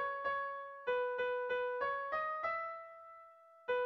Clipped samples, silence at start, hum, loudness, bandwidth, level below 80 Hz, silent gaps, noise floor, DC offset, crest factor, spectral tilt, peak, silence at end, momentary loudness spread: under 0.1%; 0 s; none; -38 LUFS; 6 kHz; -76 dBFS; none; -60 dBFS; under 0.1%; 14 dB; 1 dB/octave; -26 dBFS; 0 s; 15 LU